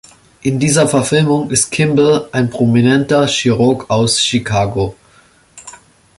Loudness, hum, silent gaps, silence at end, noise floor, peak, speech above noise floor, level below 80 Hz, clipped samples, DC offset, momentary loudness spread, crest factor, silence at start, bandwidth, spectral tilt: -13 LUFS; none; none; 0.45 s; -48 dBFS; 0 dBFS; 36 dB; -44 dBFS; under 0.1%; under 0.1%; 6 LU; 14 dB; 0.45 s; 11.5 kHz; -4.5 dB/octave